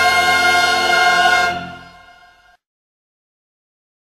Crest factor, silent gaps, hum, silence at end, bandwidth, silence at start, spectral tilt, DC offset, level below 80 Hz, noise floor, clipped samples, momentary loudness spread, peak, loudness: 16 dB; none; none; 2.2 s; 14 kHz; 0 s; -1 dB/octave; under 0.1%; -52 dBFS; -49 dBFS; under 0.1%; 11 LU; -2 dBFS; -13 LUFS